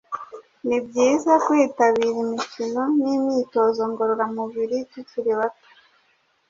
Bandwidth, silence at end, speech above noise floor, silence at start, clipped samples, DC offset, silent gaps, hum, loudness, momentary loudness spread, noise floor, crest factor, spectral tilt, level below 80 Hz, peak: 7.6 kHz; 0.95 s; 43 dB; 0.1 s; under 0.1%; under 0.1%; none; none; -22 LUFS; 11 LU; -64 dBFS; 18 dB; -4.5 dB/octave; -68 dBFS; -4 dBFS